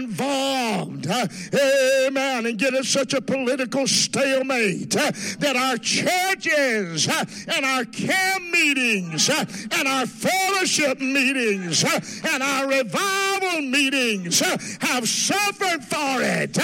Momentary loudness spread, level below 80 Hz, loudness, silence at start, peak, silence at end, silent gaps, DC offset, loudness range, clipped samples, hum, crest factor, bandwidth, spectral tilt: 5 LU; -70 dBFS; -21 LUFS; 0 s; -6 dBFS; 0 s; none; under 0.1%; 1 LU; under 0.1%; none; 16 dB; 16.5 kHz; -2.5 dB/octave